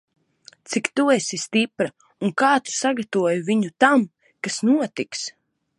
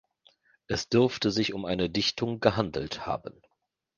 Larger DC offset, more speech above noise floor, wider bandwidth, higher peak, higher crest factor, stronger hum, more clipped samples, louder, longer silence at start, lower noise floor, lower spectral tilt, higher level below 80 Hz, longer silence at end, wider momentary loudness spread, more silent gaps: neither; second, 32 dB vs 37 dB; first, 11.5 kHz vs 9.6 kHz; about the same, -2 dBFS vs -4 dBFS; second, 20 dB vs 26 dB; neither; neither; first, -21 LUFS vs -28 LUFS; about the same, 0.7 s vs 0.7 s; second, -52 dBFS vs -65 dBFS; about the same, -4 dB/octave vs -5 dB/octave; second, -74 dBFS vs -54 dBFS; second, 0.5 s vs 0.65 s; about the same, 11 LU vs 9 LU; neither